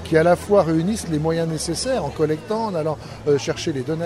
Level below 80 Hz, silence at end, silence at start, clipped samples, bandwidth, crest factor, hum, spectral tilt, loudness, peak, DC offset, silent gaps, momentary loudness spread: -44 dBFS; 0 s; 0 s; under 0.1%; 14 kHz; 18 dB; none; -5.5 dB/octave; -21 LUFS; -4 dBFS; under 0.1%; none; 8 LU